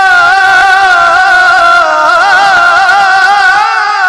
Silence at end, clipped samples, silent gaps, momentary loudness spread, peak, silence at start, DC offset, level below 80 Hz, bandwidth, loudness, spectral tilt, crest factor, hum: 0 s; under 0.1%; none; 2 LU; 0 dBFS; 0 s; under 0.1%; -42 dBFS; 12.5 kHz; -5 LUFS; -0.5 dB/octave; 6 dB; none